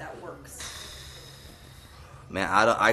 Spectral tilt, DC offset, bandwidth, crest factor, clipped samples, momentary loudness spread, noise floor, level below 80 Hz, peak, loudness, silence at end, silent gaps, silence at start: -3.5 dB/octave; under 0.1%; 13.5 kHz; 24 dB; under 0.1%; 26 LU; -48 dBFS; -52 dBFS; -6 dBFS; -26 LUFS; 0 s; none; 0 s